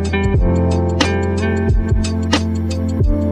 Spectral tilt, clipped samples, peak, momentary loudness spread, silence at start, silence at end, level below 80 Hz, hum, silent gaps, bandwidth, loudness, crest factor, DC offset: -6.5 dB/octave; under 0.1%; -2 dBFS; 3 LU; 0 s; 0 s; -22 dBFS; none; none; 10 kHz; -17 LUFS; 14 dB; under 0.1%